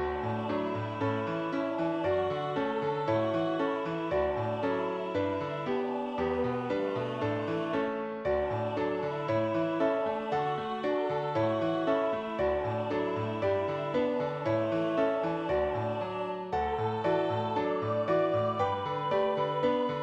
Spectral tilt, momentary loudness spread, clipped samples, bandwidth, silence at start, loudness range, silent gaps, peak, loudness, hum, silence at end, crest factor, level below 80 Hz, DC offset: -7.5 dB/octave; 4 LU; under 0.1%; 8.2 kHz; 0 s; 2 LU; none; -16 dBFS; -31 LUFS; none; 0 s; 14 dB; -56 dBFS; under 0.1%